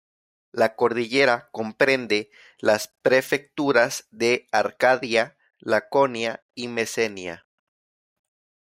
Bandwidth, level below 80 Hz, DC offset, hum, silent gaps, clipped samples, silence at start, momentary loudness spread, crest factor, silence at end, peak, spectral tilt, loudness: 16 kHz; -70 dBFS; under 0.1%; none; 6.42-6.49 s; under 0.1%; 0.55 s; 13 LU; 20 dB; 1.35 s; -4 dBFS; -3.5 dB/octave; -23 LUFS